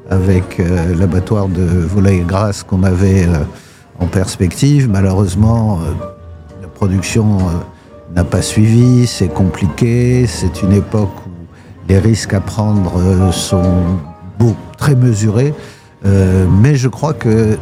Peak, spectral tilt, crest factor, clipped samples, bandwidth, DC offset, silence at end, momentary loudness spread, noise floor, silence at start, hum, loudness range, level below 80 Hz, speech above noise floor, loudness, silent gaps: 0 dBFS; -7 dB/octave; 12 dB; under 0.1%; 14.5 kHz; under 0.1%; 0 s; 9 LU; -33 dBFS; 0.05 s; none; 2 LU; -34 dBFS; 22 dB; -13 LUFS; none